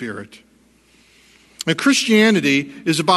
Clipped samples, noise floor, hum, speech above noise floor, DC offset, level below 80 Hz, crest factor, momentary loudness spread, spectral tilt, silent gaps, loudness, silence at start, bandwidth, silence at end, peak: under 0.1%; -54 dBFS; none; 38 dB; under 0.1%; -62 dBFS; 18 dB; 15 LU; -4 dB/octave; none; -16 LUFS; 0 s; 12.5 kHz; 0 s; 0 dBFS